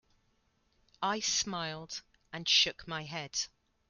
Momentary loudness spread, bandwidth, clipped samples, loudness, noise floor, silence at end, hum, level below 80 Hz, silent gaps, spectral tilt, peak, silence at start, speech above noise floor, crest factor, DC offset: 17 LU; 13 kHz; under 0.1%; -32 LUFS; -74 dBFS; 0.4 s; none; -68 dBFS; none; -1 dB/octave; -14 dBFS; 1 s; 40 dB; 22 dB; under 0.1%